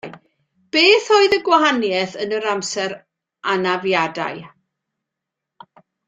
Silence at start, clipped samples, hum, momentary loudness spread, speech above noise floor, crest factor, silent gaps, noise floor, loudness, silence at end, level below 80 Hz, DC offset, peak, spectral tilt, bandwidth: 0.05 s; under 0.1%; none; 15 LU; 65 dB; 18 dB; none; -83 dBFS; -17 LUFS; 1.6 s; -64 dBFS; under 0.1%; 0 dBFS; -3 dB/octave; 9.2 kHz